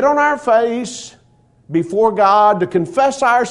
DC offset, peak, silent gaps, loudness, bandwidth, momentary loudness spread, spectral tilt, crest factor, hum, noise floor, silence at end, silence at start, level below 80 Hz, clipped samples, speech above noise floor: under 0.1%; 0 dBFS; none; -15 LUFS; 11 kHz; 13 LU; -5 dB/octave; 14 dB; none; -53 dBFS; 0 s; 0 s; -56 dBFS; under 0.1%; 38 dB